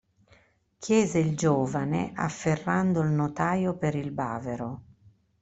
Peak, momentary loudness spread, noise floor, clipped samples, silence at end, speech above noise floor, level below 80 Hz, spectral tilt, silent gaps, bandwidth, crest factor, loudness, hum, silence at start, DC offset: -10 dBFS; 9 LU; -62 dBFS; under 0.1%; 0.6 s; 36 dB; -58 dBFS; -6.5 dB/octave; none; 8.2 kHz; 18 dB; -27 LUFS; none; 0.8 s; under 0.1%